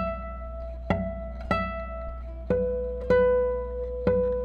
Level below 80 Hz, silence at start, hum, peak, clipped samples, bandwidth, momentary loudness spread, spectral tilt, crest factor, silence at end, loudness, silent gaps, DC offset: -36 dBFS; 0 s; 60 Hz at -35 dBFS; -10 dBFS; under 0.1%; 5.2 kHz; 15 LU; -8.5 dB/octave; 16 dB; 0 s; -28 LUFS; none; under 0.1%